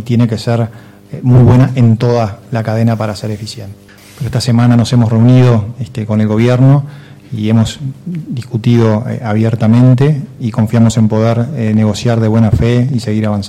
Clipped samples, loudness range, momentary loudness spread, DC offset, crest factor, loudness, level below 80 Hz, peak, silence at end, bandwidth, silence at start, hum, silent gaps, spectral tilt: under 0.1%; 3 LU; 13 LU; under 0.1%; 10 dB; -11 LUFS; -36 dBFS; 0 dBFS; 0 s; 11.5 kHz; 0 s; none; none; -8 dB/octave